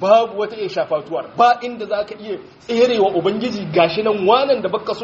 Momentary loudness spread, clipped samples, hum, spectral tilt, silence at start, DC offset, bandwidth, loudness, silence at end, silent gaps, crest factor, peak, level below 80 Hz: 10 LU; under 0.1%; none; -3 dB/octave; 0 s; under 0.1%; 7.6 kHz; -18 LUFS; 0 s; none; 16 dB; 0 dBFS; -60 dBFS